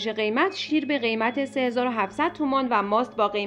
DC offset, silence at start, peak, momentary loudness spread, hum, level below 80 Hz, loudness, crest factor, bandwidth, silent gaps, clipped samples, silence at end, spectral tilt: under 0.1%; 0 s; -8 dBFS; 3 LU; none; -64 dBFS; -24 LUFS; 16 dB; 10.5 kHz; none; under 0.1%; 0 s; -5 dB/octave